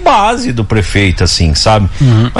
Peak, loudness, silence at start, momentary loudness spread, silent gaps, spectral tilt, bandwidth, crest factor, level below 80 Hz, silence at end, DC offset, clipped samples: 0 dBFS; -10 LUFS; 0 s; 4 LU; none; -5 dB/octave; 12 kHz; 10 dB; -20 dBFS; 0 s; under 0.1%; under 0.1%